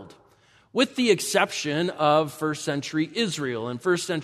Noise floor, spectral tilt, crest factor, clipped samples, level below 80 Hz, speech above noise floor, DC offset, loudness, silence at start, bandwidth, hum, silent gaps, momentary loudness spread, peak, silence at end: -59 dBFS; -4 dB/octave; 20 dB; under 0.1%; -70 dBFS; 34 dB; under 0.1%; -25 LUFS; 0 s; 13.5 kHz; none; none; 7 LU; -6 dBFS; 0 s